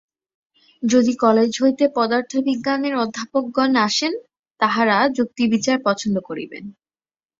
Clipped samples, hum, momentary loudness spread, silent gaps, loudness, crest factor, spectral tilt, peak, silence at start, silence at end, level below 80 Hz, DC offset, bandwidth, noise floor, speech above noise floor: under 0.1%; none; 10 LU; 4.39-4.43 s, 4.51-4.55 s; -19 LUFS; 18 dB; -4 dB/octave; -2 dBFS; 0.8 s; 0.7 s; -62 dBFS; under 0.1%; 7.8 kHz; under -90 dBFS; over 71 dB